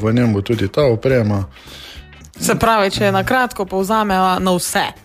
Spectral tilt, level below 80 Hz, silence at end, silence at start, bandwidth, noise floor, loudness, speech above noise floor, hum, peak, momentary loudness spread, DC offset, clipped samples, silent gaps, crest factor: -5 dB/octave; -40 dBFS; 0.1 s; 0 s; 15.5 kHz; -37 dBFS; -16 LUFS; 21 dB; none; -2 dBFS; 13 LU; under 0.1%; under 0.1%; none; 14 dB